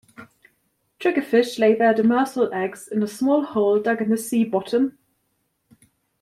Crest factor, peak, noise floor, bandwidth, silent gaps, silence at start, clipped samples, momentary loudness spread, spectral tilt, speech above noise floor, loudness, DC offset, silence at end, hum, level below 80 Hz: 16 dB; -6 dBFS; -71 dBFS; 15 kHz; none; 0.2 s; under 0.1%; 8 LU; -5.5 dB/octave; 51 dB; -21 LUFS; under 0.1%; 1.3 s; none; -68 dBFS